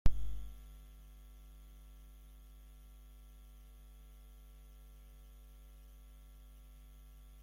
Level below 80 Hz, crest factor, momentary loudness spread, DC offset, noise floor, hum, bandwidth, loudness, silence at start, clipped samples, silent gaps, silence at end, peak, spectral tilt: -48 dBFS; 26 dB; 7 LU; under 0.1%; -56 dBFS; none; 15.5 kHz; -55 LUFS; 0.05 s; under 0.1%; none; 6.9 s; -14 dBFS; -6 dB/octave